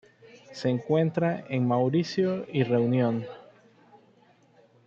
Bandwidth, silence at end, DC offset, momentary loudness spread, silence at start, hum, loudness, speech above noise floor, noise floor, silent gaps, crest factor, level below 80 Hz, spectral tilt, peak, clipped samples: 7.4 kHz; 1.5 s; under 0.1%; 9 LU; 0.35 s; none; -26 LUFS; 35 dB; -60 dBFS; none; 16 dB; -72 dBFS; -8 dB/octave; -12 dBFS; under 0.1%